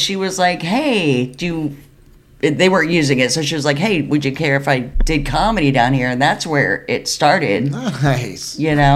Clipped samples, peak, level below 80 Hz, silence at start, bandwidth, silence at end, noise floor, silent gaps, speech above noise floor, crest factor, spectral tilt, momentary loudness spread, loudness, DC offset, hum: under 0.1%; 0 dBFS; -30 dBFS; 0 s; 14 kHz; 0 s; -46 dBFS; none; 30 dB; 16 dB; -5 dB/octave; 7 LU; -16 LUFS; under 0.1%; none